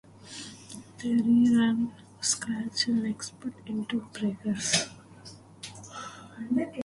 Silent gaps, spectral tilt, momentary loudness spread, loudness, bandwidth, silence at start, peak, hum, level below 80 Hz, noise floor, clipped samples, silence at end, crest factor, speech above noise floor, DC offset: none; -3.5 dB/octave; 21 LU; -28 LUFS; 11.5 kHz; 0.2 s; -10 dBFS; none; -66 dBFS; -50 dBFS; under 0.1%; 0 s; 20 dB; 22 dB; under 0.1%